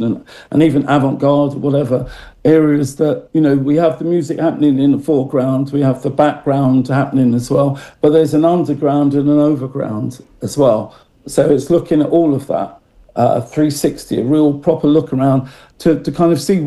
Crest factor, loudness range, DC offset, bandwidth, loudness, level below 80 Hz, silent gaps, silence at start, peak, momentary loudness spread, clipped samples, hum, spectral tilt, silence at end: 12 dB; 2 LU; under 0.1%; 12.5 kHz; -14 LUFS; -46 dBFS; none; 0 s; 0 dBFS; 8 LU; under 0.1%; none; -7.5 dB/octave; 0 s